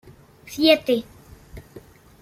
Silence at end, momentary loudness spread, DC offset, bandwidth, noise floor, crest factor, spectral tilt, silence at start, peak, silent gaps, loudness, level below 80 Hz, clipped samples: 0.4 s; 26 LU; under 0.1%; 16 kHz; -47 dBFS; 22 dB; -4 dB/octave; 0.5 s; -4 dBFS; none; -20 LUFS; -52 dBFS; under 0.1%